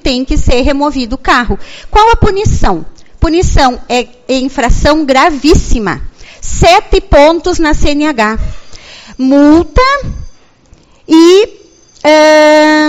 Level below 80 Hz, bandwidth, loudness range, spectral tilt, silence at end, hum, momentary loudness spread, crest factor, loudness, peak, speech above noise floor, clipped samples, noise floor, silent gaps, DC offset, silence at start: -18 dBFS; 11.5 kHz; 3 LU; -5 dB/octave; 0 s; none; 12 LU; 8 dB; -9 LUFS; 0 dBFS; 35 dB; 2%; -42 dBFS; none; under 0.1%; 0.05 s